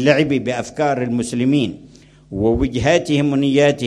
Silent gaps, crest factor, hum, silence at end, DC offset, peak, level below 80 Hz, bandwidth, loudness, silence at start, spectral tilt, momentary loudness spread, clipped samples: none; 18 dB; none; 0 s; under 0.1%; 0 dBFS; -38 dBFS; 11.5 kHz; -18 LUFS; 0 s; -6 dB/octave; 6 LU; under 0.1%